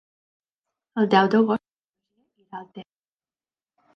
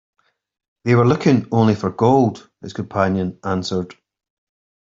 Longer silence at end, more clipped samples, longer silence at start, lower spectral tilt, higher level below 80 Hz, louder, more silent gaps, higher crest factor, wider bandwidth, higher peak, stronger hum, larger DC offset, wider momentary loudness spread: first, 1.15 s vs 0.9 s; neither; about the same, 0.95 s vs 0.85 s; about the same, -7.5 dB/octave vs -7.5 dB/octave; second, -74 dBFS vs -56 dBFS; second, -21 LUFS vs -18 LUFS; first, 1.84-1.88 s vs none; first, 22 dB vs 16 dB; second, 6.4 kHz vs 7.6 kHz; about the same, -4 dBFS vs -2 dBFS; neither; neither; first, 23 LU vs 14 LU